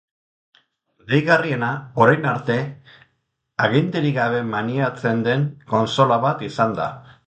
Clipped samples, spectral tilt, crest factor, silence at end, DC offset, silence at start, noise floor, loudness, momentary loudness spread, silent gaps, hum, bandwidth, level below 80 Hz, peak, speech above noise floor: under 0.1%; -7 dB/octave; 20 dB; 0.25 s; under 0.1%; 1.05 s; -72 dBFS; -20 LUFS; 8 LU; none; none; 8.6 kHz; -60 dBFS; 0 dBFS; 52 dB